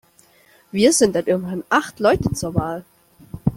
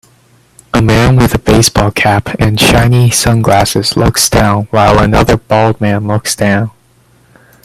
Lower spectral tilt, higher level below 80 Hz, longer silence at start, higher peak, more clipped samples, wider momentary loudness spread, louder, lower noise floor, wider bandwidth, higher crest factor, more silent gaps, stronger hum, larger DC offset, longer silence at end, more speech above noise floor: about the same, -4.5 dB/octave vs -4.5 dB/octave; second, -44 dBFS vs -26 dBFS; about the same, 0.75 s vs 0.75 s; about the same, -2 dBFS vs 0 dBFS; neither; first, 14 LU vs 5 LU; second, -19 LUFS vs -9 LUFS; first, -54 dBFS vs -47 dBFS; about the same, 16.5 kHz vs 15.5 kHz; first, 18 dB vs 10 dB; neither; neither; neither; second, 0 s vs 0.95 s; second, 35 dB vs 39 dB